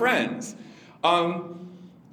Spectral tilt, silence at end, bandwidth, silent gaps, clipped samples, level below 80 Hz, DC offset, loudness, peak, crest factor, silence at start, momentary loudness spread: -4 dB/octave; 0.25 s; 19.5 kHz; none; under 0.1%; -78 dBFS; under 0.1%; -25 LUFS; -6 dBFS; 20 dB; 0 s; 23 LU